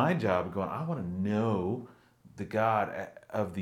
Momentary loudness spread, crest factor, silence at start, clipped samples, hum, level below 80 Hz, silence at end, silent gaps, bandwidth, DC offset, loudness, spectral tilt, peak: 10 LU; 18 dB; 0 s; under 0.1%; none; -70 dBFS; 0 s; none; 15 kHz; under 0.1%; -32 LUFS; -8 dB/octave; -12 dBFS